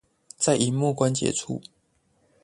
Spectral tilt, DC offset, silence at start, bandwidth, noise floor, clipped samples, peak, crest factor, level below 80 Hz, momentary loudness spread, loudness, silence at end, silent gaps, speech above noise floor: -4.5 dB/octave; under 0.1%; 0.4 s; 11.5 kHz; -67 dBFS; under 0.1%; -8 dBFS; 20 dB; -60 dBFS; 11 LU; -25 LUFS; 0.85 s; none; 43 dB